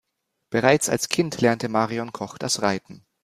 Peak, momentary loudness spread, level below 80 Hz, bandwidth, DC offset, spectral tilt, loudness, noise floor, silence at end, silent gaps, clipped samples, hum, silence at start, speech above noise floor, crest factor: -2 dBFS; 11 LU; -60 dBFS; 15.5 kHz; under 0.1%; -4 dB/octave; -23 LUFS; -78 dBFS; 0.25 s; none; under 0.1%; none; 0.5 s; 55 dB; 22 dB